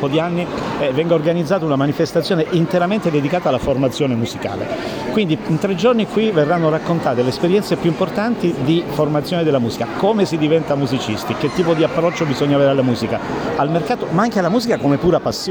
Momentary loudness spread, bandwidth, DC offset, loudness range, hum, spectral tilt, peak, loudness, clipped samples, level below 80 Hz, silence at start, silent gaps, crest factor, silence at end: 5 LU; over 20 kHz; under 0.1%; 1 LU; none; -6.5 dB/octave; -4 dBFS; -17 LUFS; under 0.1%; -46 dBFS; 0 s; none; 14 dB; 0 s